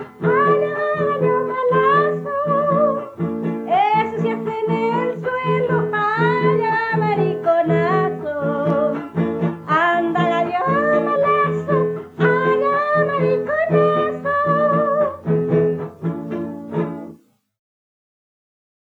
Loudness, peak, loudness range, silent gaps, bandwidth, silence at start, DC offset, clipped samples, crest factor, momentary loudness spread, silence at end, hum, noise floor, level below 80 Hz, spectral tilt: -19 LUFS; -2 dBFS; 3 LU; none; 7.4 kHz; 0 s; under 0.1%; under 0.1%; 16 dB; 8 LU; 1.8 s; none; -45 dBFS; -62 dBFS; -8.5 dB/octave